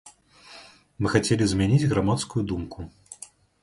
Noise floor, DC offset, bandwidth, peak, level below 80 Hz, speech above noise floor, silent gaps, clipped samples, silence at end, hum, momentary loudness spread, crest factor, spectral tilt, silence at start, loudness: -50 dBFS; under 0.1%; 11.5 kHz; -4 dBFS; -46 dBFS; 27 dB; none; under 0.1%; 0.5 s; none; 23 LU; 20 dB; -6 dB/octave; 0.05 s; -24 LUFS